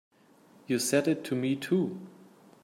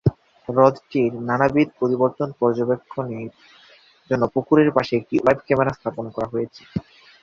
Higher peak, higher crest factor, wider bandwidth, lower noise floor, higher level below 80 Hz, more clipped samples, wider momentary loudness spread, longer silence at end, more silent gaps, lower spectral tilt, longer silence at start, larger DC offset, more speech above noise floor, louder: second, -12 dBFS vs -2 dBFS; about the same, 20 dB vs 20 dB; first, 16 kHz vs 7.2 kHz; first, -60 dBFS vs -52 dBFS; second, -78 dBFS vs -50 dBFS; neither; about the same, 13 LU vs 13 LU; first, 0.55 s vs 0.4 s; neither; second, -5 dB/octave vs -8.5 dB/octave; first, 0.7 s vs 0.05 s; neither; about the same, 31 dB vs 32 dB; second, -29 LUFS vs -21 LUFS